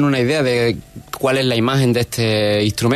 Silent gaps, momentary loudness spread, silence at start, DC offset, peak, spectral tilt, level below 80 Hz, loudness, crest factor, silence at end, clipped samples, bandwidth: none; 6 LU; 0 s; under 0.1%; -4 dBFS; -5.5 dB/octave; -46 dBFS; -17 LUFS; 12 dB; 0 s; under 0.1%; 14 kHz